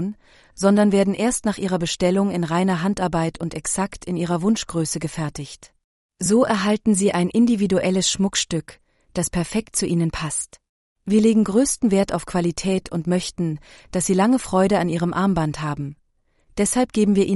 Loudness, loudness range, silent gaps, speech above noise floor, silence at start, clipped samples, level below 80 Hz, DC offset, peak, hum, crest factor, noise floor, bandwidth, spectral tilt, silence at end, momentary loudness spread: -21 LUFS; 3 LU; 5.84-6.09 s, 10.69-10.96 s; 42 dB; 0 s; under 0.1%; -46 dBFS; under 0.1%; -4 dBFS; none; 16 dB; -63 dBFS; 11.5 kHz; -5 dB/octave; 0 s; 10 LU